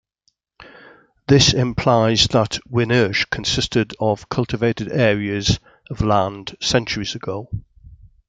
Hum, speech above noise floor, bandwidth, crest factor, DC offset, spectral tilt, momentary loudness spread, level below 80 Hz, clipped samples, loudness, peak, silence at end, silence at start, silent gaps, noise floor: none; 49 dB; 9.4 kHz; 20 dB; under 0.1%; -4.5 dB/octave; 12 LU; -40 dBFS; under 0.1%; -19 LUFS; 0 dBFS; 0.4 s; 0.6 s; none; -68 dBFS